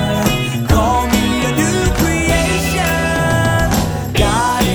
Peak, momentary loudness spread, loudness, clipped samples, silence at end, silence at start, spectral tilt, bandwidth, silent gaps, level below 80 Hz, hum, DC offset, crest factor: 0 dBFS; 2 LU; -15 LUFS; under 0.1%; 0 s; 0 s; -4.5 dB/octave; over 20 kHz; none; -24 dBFS; none; under 0.1%; 14 dB